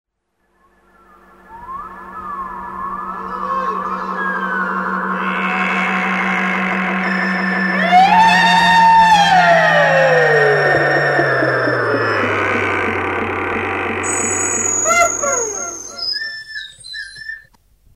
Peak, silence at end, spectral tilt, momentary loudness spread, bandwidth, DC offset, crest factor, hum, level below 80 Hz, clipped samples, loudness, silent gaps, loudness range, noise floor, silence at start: -2 dBFS; 0.55 s; -3 dB/octave; 18 LU; 16 kHz; under 0.1%; 14 dB; none; -50 dBFS; under 0.1%; -14 LUFS; none; 12 LU; -66 dBFS; 1.5 s